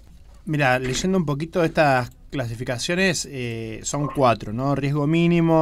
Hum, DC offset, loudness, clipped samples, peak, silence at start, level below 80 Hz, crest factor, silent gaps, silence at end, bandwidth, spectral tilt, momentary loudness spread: none; under 0.1%; -22 LUFS; under 0.1%; -6 dBFS; 0.2 s; -44 dBFS; 16 dB; none; 0 s; 15.5 kHz; -5.5 dB/octave; 11 LU